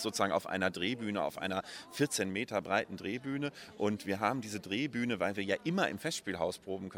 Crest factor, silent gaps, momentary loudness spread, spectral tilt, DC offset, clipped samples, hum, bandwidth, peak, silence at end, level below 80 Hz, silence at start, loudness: 20 dB; none; 6 LU; -4 dB/octave; under 0.1%; under 0.1%; none; 17 kHz; -14 dBFS; 0 s; -72 dBFS; 0 s; -35 LUFS